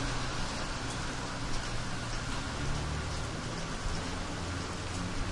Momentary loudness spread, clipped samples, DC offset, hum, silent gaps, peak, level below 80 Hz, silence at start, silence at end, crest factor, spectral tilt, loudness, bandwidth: 2 LU; under 0.1%; under 0.1%; none; none; -22 dBFS; -40 dBFS; 0 s; 0 s; 14 dB; -4 dB/octave; -36 LUFS; 11.5 kHz